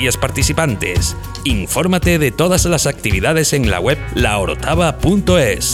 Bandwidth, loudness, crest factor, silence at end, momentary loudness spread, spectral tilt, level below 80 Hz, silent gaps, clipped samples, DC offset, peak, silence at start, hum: 18 kHz; -15 LUFS; 14 dB; 0 s; 4 LU; -4.5 dB/octave; -26 dBFS; none; under 0.1%; under 0.1%; -2 dBFS; 0 s; none